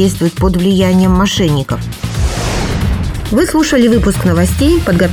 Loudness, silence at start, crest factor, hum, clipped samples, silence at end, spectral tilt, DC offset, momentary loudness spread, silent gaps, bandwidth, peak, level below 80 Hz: -12 LUFS; 0 s; 12 dB; none; under 0.1%; 0 s; -6 dB/octave; under 0.1%; 7 LU; none; 17.5 kHz; 0 dBFS; -22 dBFS